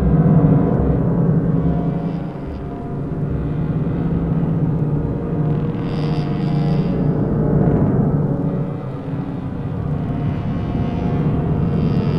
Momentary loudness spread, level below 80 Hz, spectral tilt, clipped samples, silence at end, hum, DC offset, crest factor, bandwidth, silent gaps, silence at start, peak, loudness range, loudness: 9 LU; -30 dBFS; -11 dB/octave; under 0.1%; 0 s; none; under 0.1%; 16 dB; 5.4 kHz; none; 0 s; -2 dBFS; 3 LU; -19 LUFS